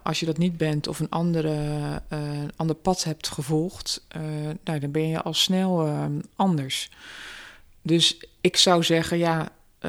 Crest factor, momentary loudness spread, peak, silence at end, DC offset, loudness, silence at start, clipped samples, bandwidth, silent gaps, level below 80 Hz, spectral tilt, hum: 20 dB; 12 LU; -4 dBFS; 0 s; under 0.1%; -24 LUFS; 0.05 s; under 0.1%; 16 kHz; none; -50 dBFS; -4.5 dB/octave; none